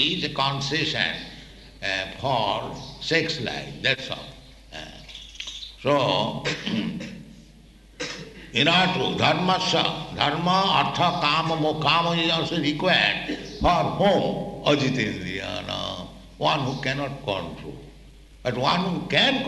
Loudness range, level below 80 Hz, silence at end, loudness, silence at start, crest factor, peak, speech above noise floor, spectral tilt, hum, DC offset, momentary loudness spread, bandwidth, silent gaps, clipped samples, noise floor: 7 LU; -48 dBFS; 0 s; -23 LUFS; 0 s; 22 dB; -4 dBFS; 26 dB; -4.5 dB/octave; none; under 0.1%; 16 LU; 12 kHz; none; under 0.1%; -50 dBFS